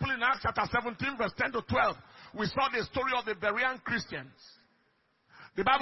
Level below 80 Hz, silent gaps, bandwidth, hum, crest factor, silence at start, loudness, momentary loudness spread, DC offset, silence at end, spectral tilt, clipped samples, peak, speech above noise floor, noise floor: -58 dBFS; none; 5.8 kHz; none; 20 dB; 0 s; -31 LUFS; 13 LU; under 0.1%; 0 s; -2.5 dB/octave; under 0.1%; -12 dBFS; 40 dB; -72 dBFS